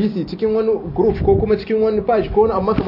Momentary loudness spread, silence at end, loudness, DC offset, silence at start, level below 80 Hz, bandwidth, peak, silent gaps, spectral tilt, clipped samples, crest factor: 4 LU; 0 s; -17 LUFS; under 0.1%; 0 s; -34 dBFS; 5.8 kHz; -2 dBFS; none; -10 dB/octave; under 0.1%; 14 dB